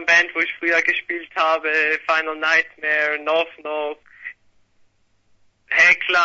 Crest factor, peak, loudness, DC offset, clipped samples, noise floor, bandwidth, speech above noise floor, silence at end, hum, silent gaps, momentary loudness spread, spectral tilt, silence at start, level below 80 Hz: 18 dB; -2 dBFS; -18 LUFS; under 0.1%; under 0.1%; -60 dBFS; 8 kHz; 40 dB; 0 s; none; none; 14 LU; -1.5 dB/octave; 0 s; -64 dBFS